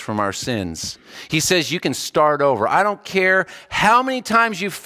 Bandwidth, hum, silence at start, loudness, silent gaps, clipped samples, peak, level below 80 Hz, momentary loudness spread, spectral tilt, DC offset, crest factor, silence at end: 16 kHz; none; 0 s; -18 LUFS; none; under 0.1%; -2 dBFS; -50 dBFS; 9 LU; -3.5 dB/octave; under 0.1%; 16 dB; 0.05 s